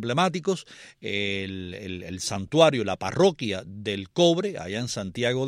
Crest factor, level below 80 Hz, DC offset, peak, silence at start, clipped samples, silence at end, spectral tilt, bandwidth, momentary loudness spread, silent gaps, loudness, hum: 22 dB; -60 dBFS; under 0.1%; -4 dBFS; 0 s; under 0.1%; 0 s; -4.5 dB/octave; 15 kHz; 15 LU; none; -26 LUFS; none